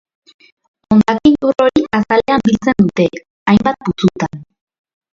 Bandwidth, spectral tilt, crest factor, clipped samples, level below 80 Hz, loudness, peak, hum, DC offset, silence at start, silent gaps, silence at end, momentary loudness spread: 7.4 kHz; -7 dB/octave; 14 dB; under 0.1%; -44 dBFS; -14 LUFS; 0 dBFS; none; under 0.1%; 0.9 s; 3.30-3.46 s; 0.7 s; 7 LU